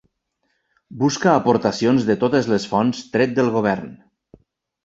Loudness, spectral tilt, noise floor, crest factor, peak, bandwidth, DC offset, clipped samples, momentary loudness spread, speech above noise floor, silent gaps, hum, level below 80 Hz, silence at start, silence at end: -19 LUFS; -6 dB/octave; -71 dBFS; 18 dB; -2 dBFS; 8 kHz; under 0.1%; under 0.1%; 6 LU; 53 dB; none; none; -56 dBFS; 0.9 s; 0.9 s